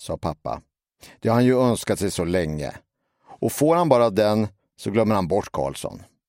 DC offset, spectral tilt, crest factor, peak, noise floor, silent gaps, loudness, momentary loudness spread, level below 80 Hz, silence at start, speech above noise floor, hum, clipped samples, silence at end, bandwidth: under 0.1%; -6 dB/octave; 20 dB; -2 dBFS; -51 dBFS; none; -22 LUFS; 15 LU; -48 dBFS; 0 s; 29 dB; none; under 0.1%; 0.25 s; 16.5 kHz